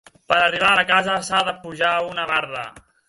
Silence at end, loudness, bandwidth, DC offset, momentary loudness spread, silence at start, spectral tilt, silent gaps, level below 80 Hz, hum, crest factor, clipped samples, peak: 0.3 s; -19 LUFS; 11.5 kHz; under 0.1%; 12 LU; 0.3 s; -2.5 dB/octave; none; -56 dBFS; none; 20 dB; under 0.1%; -2 dBFS